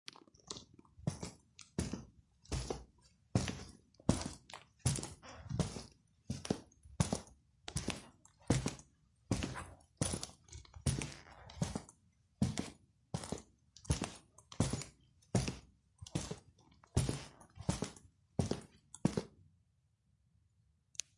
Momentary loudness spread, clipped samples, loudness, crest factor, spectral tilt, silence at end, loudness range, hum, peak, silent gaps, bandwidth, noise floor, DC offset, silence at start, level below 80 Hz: 18 LU; under 0.1%; -41 LUFS; 28 dB; -5 dB/octave; 1.9 s; 2 LU; none; -14 dBFS; none; 11.5 kHz; -76 dBFS; under 0.1%; 0.45 s; -56 dBFS